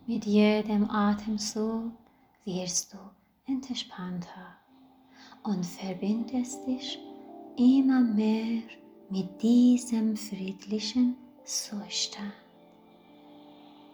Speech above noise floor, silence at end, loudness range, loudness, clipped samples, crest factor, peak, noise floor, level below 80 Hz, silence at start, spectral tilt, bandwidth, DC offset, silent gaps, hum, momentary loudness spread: 31 dB; 0.4 s; 10 LU; -28 LUFS; under 0.1%; 18 dB; -12 dBFS; -59 dBFS; -68 dBFS; 0.05 s; -4.5 dB/octave; over 20 kHz; under 0.1%; none; none; 19 LU